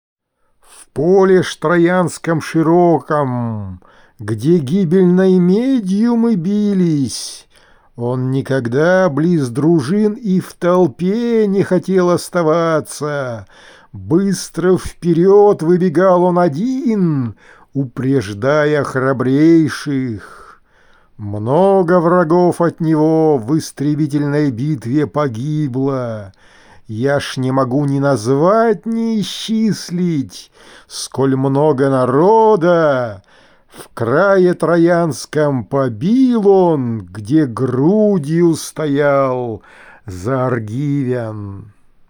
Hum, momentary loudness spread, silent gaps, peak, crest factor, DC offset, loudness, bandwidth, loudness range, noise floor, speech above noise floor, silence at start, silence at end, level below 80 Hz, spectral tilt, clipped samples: none; 12 LU; none; -2 dBFS; 14 dB; under 0.1%; -14 LUFS; over 20 kHz; 4 LU; -58 dBFS; 44 dB; 0.8 s; 0.4 s; -52 dBFS; -7 dB/octave; under 0.1%